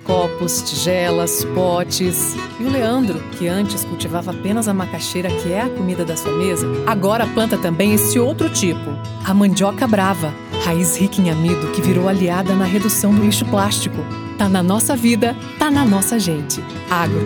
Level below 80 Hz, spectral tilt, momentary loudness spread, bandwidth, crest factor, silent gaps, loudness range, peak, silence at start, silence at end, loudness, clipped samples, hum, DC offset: -48 dBFS; -4.5 dB/octave; 7 LU; 19.5 kHz; 16 dB; none; 4 LU; -2 dBFS; 0 s; 0 s; -17 LUFS; under 0.1%; none; under 0.1%